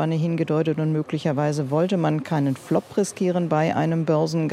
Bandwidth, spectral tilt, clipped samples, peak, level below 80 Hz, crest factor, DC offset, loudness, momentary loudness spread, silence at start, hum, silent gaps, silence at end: 12.5 kHz; -7 dB/octave; under 0.1%; -6 dBFS; -66 dBFS; 16 dB; under 0.1%; -23 LUFS; 3 LU; 0 s; none; none; 0 s